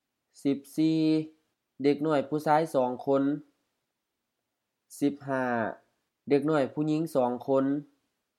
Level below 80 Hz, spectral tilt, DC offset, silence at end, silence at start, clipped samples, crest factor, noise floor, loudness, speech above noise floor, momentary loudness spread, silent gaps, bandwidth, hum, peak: -82 dBFS; -7 dB/octave; under 0.1%; 0.55 s; 0.45 s; under 0.1%; 20 dB; -84 dBFS; -28 LUFS; 57 dB; 8 LU; none; 14.5 kHz; none; -10 dBFS